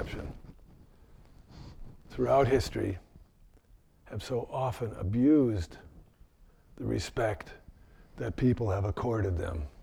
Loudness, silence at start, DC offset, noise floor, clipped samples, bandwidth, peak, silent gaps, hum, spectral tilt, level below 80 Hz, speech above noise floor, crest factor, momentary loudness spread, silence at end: -31 LUFS; 0 s; under 0.1%; -60 dBFS; under 0.1%; 16 kHz; -14 dBFS; none; none; -7.5 dB/octave; -46 dBFS; 31 dB; 18 dB; 22 LU; 0 s